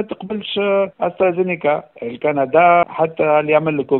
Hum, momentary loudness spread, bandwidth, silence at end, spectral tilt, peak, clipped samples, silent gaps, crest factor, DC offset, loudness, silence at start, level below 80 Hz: none; 10 LU; 4.2 kHz; 0 s; -10.5 dB/octave; 0 dBFS; under 0.1%; none; 16 dB; under 0.1%; -17 LUFS; 0 s; -60 dBFS